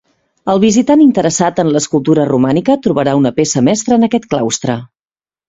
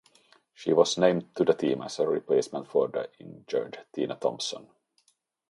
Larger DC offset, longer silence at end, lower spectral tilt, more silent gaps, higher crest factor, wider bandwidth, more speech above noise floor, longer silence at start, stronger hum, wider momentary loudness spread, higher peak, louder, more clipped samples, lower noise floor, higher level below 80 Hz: neither; second, 0.65 s vs 0.85 s; about the same, -5.5 dB/octave vs -4.5 dB/octave; neither; second, 12 dB vs 22 dB; second, 8 kHz vs 11.5 kHz; first, over 79 dB vs 43 dB; second, 0.45 s vs 0.6 s; neither; second, 7 LU vs 12 LU; first, 0 dBFS vs -6 dBFS; first, -12 LUFS vs -28 LUFS; neither; first, under -90 dBFS vs -70 dBFS; first, -50 dBFS vs -74 dBFS